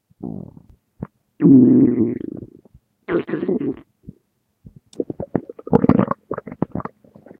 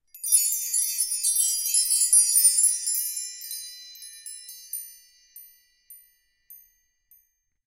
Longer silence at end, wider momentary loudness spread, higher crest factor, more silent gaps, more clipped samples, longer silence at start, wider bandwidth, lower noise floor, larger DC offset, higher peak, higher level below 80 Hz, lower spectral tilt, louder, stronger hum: second, 0.55 s vs 1.1 s; about the same, 24 LU vs 23 LU; about the same, 20 dB vs 22 dB; neither; neither; about the same, 0.2 s vs 0.15 s; second, 3.8 kHz vs 17 kHz; about the same, -65 dBFS vs -68 dBFS; neither; first, 0 dBFS vs -6 dBFS; first, -50 dBFS vs -76 dBFS; first, -11 dB/octave vs 8 dB/octave; about the same, -18 LUFS vs -20 LUFS; neither